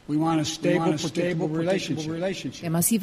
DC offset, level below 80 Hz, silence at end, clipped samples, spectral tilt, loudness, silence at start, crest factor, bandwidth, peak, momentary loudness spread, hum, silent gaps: under 0.1%; -58 dBFS; 0 s; under 0.1%; -5 dB/octave; -25 LUFS; 0.1 s; 16 dB; 15.5 kHz; -8 dBFS; 6 LU; none; none